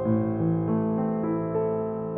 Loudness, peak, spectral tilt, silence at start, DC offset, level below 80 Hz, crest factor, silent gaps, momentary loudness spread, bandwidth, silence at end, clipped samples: -26 LUFS; -12 dBFS; -14 dB/octave; 0 s; under 0.1%; -56 dBFS; 12 dB; none; 3 LU; 3.4 kHz; 0 s; under 0.1%